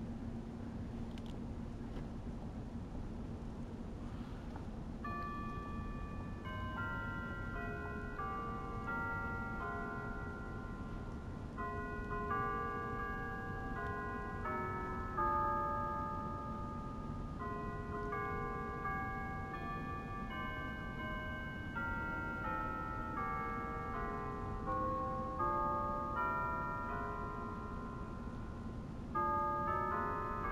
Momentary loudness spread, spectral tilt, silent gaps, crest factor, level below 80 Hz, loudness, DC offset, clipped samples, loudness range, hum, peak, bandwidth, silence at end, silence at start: 10 LU; -7.5 dB/octave; none; 16 dB; -50 dBFS; -42 LUFS; under 0.1%; under 0.1%; 7 LU; none; -24 dBFS; 15.5 kHz; 0 s; 0 s